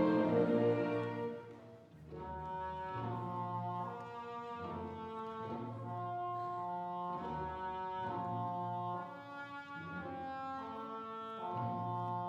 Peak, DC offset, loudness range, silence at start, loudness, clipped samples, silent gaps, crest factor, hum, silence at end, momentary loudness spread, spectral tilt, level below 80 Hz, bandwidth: -20 dBFS; under 0.1%; 4 LU; 0 s; -40 LUFS; under 0.1%; none; 18 dB; none; 0 s; 13 LU; -8.5 dB/octave; -68 dBFS; 8.2 kHz